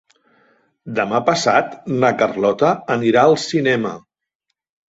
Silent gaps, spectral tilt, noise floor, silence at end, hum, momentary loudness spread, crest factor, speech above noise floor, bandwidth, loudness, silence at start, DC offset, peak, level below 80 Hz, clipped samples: none; -5 dB/octave; -76 dBFS; 0.9 s; none; 10 LU; 18 dB; 60 dB; 8 kHz; -17 LUFS; 0.85 s; under 0.1%; -2 dBFS; -60 dBFS; under 0.1%